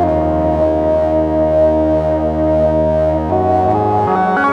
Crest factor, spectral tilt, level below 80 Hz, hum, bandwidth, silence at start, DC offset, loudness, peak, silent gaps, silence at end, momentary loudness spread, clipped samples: 10 dB; -9 dB/octave; -28 dBFS; none; 6.8 kHz; 0 s; under 0.1%; -14 LUFS; -2 dBFS; none; 0 s; 2 LU; under 0.1%